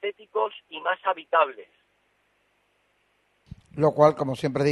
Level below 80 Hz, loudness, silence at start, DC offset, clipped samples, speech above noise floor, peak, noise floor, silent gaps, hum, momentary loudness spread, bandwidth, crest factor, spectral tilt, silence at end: -62 dBFS; -24 LUFS; 0.05 s; under 0.1%; under 0.1%; 45 dB; -4 dBFS; -69 dBFS; none; 50 Hz at -65 dBFS; 11 LU; 12 kHz; 22 dB; -6.5 dB/octave; 0 s